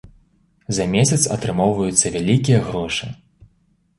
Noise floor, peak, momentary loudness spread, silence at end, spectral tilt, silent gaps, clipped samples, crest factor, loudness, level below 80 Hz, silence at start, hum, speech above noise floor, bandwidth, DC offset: -61 dBFS; 0 dBFS; 9 LU; 0.85 s; -4.5 dB/octave; none; under 0.1%; 20 dB; -18 LUFS; -46 dBFS; 0.05 s; none; 43 dB; 11.5 kHz; under 0.1%